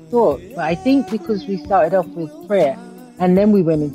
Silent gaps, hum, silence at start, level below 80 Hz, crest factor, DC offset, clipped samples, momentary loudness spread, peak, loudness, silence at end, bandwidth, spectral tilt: none; none; 0.1 s; -48 dBFS; 14 dB; under 0.1%; under 0.1%; 9 LU; -4 dBFS; -17 LUFS; 0 s; 15 kHz; -8 dB/octave